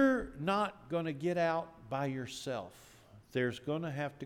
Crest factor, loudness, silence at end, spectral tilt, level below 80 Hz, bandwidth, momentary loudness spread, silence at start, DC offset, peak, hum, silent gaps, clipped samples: 18 dB; -36 LUFS; 0 s; -6 dB/octave; -62 dBFS; 15.5 kHz; 8 LU; 0 s; under 0.1%; -18 dBFS; none; none; under 0.1%